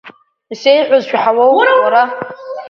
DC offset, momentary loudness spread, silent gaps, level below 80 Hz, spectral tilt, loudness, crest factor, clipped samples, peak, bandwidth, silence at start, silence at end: under 0.1%; 15 LU; none; -64 dBFS; -4 dB/octave; -11 LUFS; 12 dB; under 0.1%; 0 dBFS; 6.8 kHz; 0.05 s; 0 s